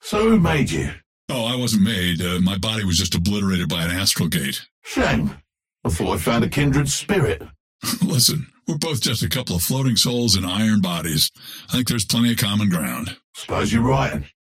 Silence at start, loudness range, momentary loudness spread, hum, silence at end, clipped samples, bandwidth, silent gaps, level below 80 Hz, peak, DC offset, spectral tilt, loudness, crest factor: 0.05 s; 2 LU; 11 LU; none; 0.3 s; under 0.1%; 16.5 kHz; 1.06-1.28 s, 4.71-4.82 s, 7.60-7.79 s, 13.24-13.33 s; -40 dBFS; -2 dBFS; under 0.1%; -4 dB/octave; -20 LUFS; 18 dB